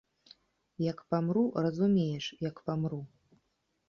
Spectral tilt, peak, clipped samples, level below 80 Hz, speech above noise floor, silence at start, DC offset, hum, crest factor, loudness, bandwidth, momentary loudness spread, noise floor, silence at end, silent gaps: -8 dB/octave; -16 dBFS; under 0.1%; -68 dBFS; 47 dB; 0.8 s; under 0.1%; none; 18 dB; -32 LUFS; 7 kHz; 9 LU; -78 dBFS; 0.8 s; none